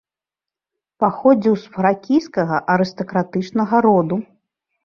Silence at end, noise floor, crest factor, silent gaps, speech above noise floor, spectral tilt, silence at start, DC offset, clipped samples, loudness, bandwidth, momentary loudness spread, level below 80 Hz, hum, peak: 0.6 s; -89 dBFS; 16 dB; none; 71 dB; -8 dB/octave; 1 s; under 0.1%; under 0.1%; -18 LUFS; 7 kHz; 7 LU; -60 dBFS; none; -2 dBFS